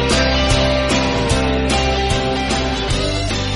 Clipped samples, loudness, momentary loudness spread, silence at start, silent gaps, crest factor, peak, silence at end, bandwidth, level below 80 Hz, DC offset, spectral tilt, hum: under 0.1%; -17 LUFS; 4 LU; 0 s; none; 14 dB; -2 dBFS; 0 s; 11.5 kHz; -24 dBFS; under 0.1%; -4.5 dB/octave; none